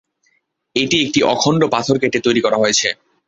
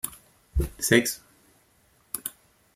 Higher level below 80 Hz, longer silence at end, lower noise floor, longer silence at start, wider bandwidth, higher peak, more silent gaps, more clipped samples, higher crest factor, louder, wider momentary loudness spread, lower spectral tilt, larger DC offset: second, -54 dBFS vs -38 dBFS; about the same, 0.35 s vs 0.45 s; about the same, -64 dBFS vs -63 dBFS; first, 0.75 s vs 0.05 s; second, 8.4 kHz vs 16.5 kHz; about the same, -2 dBFS vs -4 dBFS; neither; neither; second, 16 dB vs 26 dB; first, -16 LUFS vs -27 LUFS; second, 5 LU vs 16 LU; about the same, -3.5 dB/octave vs -3.5 dB/octave; neither